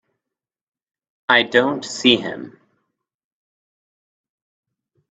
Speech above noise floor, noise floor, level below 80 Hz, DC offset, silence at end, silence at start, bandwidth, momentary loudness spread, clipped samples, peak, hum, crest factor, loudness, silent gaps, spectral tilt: 68 dB; -86 dBFS; -66 dBFS; under 0.1%; 2.6 s; 1.3 s; 8.4 kHz; 16 LU; under 0.1%; 0 dBFS; none; 24 dB; -17 LUFS; none; -3 dB/octave